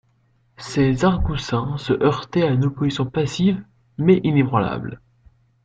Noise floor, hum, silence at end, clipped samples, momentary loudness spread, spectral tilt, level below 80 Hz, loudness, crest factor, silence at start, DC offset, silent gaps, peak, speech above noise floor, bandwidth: -61 dBFS; none; 0.7 s; under 0.1%; 11 LU; -7 dB/octave; -38 dBFS; -20 LUFS; 18 dB; 0.6 s; under 0.1%; none; -2 dBFS; 42 dB; 8.8 kHz